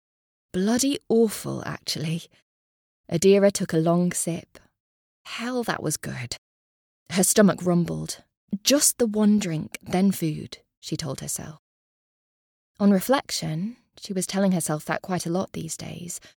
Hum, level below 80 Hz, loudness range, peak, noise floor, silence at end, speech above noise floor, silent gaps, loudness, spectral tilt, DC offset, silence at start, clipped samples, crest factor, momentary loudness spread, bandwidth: none; -60 dBFS; 6 LU; -4 dBFS; under -90 dBFS; 0.15 s; over 66 dB; 2.42-3.04 s, 4.80-5.25 s, 6.38-7.06 s, 8.37-8.48 s, 10.77-10.82 s, 11.59-12.75 s; -24 LUFS; -4.5 dB/octave; under 0.1%; 0.55 s; under 0.1%; 22 dB; 16 LU; 20 kHz